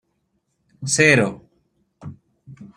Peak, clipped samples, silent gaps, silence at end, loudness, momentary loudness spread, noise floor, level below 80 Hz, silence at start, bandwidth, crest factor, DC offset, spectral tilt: 0 dBFS; under 0.1%; none; 0.1 s; -16 LUFS; 26 LU; -71 dBFS; -60 dBFS; 0.8 s; 16 kHz; 22 dB; under 0.1%; -4 dB/octave